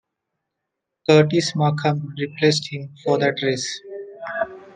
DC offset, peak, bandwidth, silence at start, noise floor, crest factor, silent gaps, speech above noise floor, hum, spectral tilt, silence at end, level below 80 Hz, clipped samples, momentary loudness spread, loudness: under 0.1%; -2 dBFS; 9.6 kHz; 1.1 s; -81 dBFS; 20 dB; none; 61 dB; none; -5.5 dB/octave; 0.05 s; -66 dBFS; under 0.1%; 15 LU; -21 LUFS